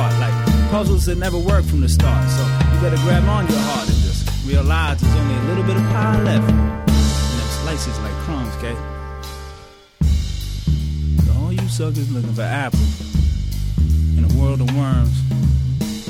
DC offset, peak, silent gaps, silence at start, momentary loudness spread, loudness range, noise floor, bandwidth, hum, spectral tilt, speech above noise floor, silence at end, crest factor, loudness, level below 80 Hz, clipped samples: under 0.1%; -2 dBFS; none; 0 s; 8 LU; 6 LU; -41 dBFS; 16 kHz; none; -6.5 dB/octave; 24 dB; 0 s; 14 dB; -18 LUFS; -22 dBFS; under 0.1%